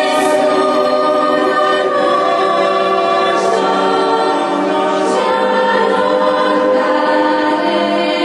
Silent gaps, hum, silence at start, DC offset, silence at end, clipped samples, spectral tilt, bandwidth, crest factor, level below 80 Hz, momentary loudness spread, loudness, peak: none; none; 0 s; under 0.1%; 0 s; under 0.1%; -4 dB/octave; 12 kHz; 12 dB; -56 dBFS; 2 LU; -13 LUFS; 0 dBFS